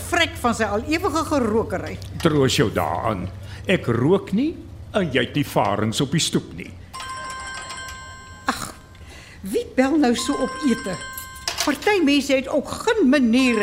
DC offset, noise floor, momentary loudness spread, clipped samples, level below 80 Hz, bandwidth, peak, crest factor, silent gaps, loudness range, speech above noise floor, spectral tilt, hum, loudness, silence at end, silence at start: under 0.1%; -42 dBFS; 15 LU; under 0.1%; -44 dBFS; 16 kHz; -4 dBFS; 18 dB; none; 6 LU; 21 dB; -4.5 dB/octave; none; -21 LUFS; 0 s; 0 s